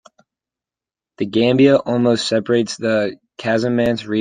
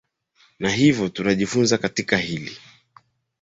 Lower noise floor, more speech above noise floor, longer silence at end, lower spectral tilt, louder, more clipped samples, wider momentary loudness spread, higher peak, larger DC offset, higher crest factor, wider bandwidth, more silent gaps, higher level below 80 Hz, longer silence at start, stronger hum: first, -89 dBFS vs -61 dBFS; first, 73 dB vs 40 dB; second, 0 s vs 0.85 s; about the same, -5.5 dB/octave vs -4.5 dB/octave; first, -17 LUFS vs -21 LUFS; neither; second, 9 LU vs 12 LU; about the same, -2 dBFS vs -2 dBFS; neither; about the same, 16 dB vs 20 dB; first, 9.6 kHz vs 8 kHz; neither; about the same, -56 dBFS vs -54 dBFS; first, 1.2 s vs 0.6 s; neither